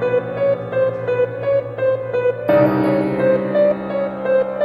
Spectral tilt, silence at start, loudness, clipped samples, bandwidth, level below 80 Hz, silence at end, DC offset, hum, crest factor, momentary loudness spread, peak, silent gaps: -9 dB/octave; 0 s; -18 LUFS; under 0.1%; 12.5 kHz; -54 dBFS; 0 s; under 0.1%; none; 14 dB; 5 LU; -2 dBFS; none